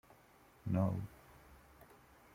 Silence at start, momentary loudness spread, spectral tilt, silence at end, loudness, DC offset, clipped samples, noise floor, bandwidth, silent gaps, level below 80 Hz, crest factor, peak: 0.65 s; 26 LU; -9 dB/octave; 0.8 s; -39 LUFS; under 0.1%; under 0.1%; -65 dBFS; 16 kHz; none; -66 dBFS; 20 dB; -22 dBFS